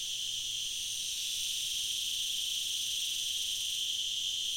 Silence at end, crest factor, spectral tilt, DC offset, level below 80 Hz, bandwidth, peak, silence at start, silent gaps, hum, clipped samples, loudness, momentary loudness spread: 0 s; 12 dB; 3 dB/octave; under 0.1%; -66 dBFS; 16.5 kHz; -22 dBFS; 0 s; none; none; under 0.1%; -32 LUFS; 2 LU